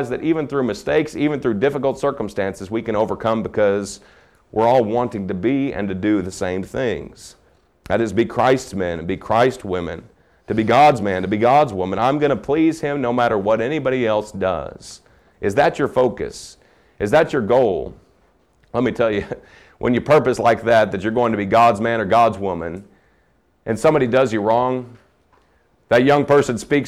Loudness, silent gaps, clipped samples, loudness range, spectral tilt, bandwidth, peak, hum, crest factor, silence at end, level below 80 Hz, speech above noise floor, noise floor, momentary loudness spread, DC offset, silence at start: -19 LUFS; none; under 0.1%; 4 LU; -6 dB/octave; 14.5 kHz; -4 dBFS; none; 14 dB; 0 s; -48 dBFS; 42 dB; -60 dBFS; 12 LU; under 0.1%; 0 s